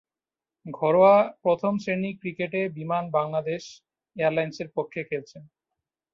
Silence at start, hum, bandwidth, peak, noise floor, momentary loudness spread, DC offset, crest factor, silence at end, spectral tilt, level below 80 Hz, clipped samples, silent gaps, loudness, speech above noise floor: 0.65 s; none; 7.4 kHz; -8 dBFS; under -90 dBFS; 15 LU; under 0.1%; 18 dB; 0.7 s; -7 dB/octave; -70 dBFS; under 0.1%; none; -25 LUFS; over 65 dB